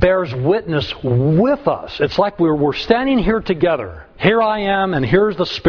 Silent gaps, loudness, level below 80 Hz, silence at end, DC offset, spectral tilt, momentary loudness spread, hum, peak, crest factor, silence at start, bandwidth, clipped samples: none; -17 LUFS; -36 dBFS; 0 s; under 0.1%; -8 dB/octave; 5 LU; none; 0 dBFS; 16 dB; 0 s; 5.4 kHz; under 0.1%